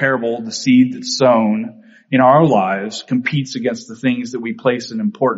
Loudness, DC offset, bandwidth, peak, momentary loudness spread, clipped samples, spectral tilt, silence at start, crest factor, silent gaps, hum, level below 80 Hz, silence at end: -16 LUFS; under 0.1%; 8 kHz; 0 dBFS; 11 LU; under 0.1%; -5 dB/octave; 0 s; 16 dB; none; none; -60 dBFS; 0 s